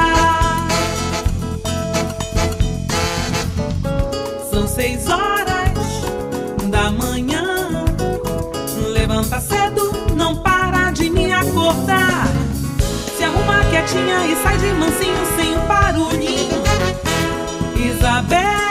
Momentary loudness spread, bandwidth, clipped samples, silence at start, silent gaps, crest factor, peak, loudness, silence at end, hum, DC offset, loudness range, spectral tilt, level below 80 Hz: 7 LU; 16 kHz; under 0.1%; 0 s; none; 14 dB; -4 dBFS; -18 LUFS; 0 s; none; under 0.1%; 4 LU; -4.5 dB/octave; -26 dBFS